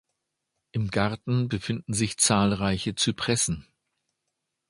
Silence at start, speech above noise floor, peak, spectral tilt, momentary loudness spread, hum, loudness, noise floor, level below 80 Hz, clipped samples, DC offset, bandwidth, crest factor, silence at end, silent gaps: 0.75 s; 56 dB; -6 dBFS; -4 dB/octave; 9 LU; none; -26 LUFS; -82 dBFS; -50 dBFS; under 0.1%; under 0.1%; 11.5 kHz; 22 dB; 1.1 s; none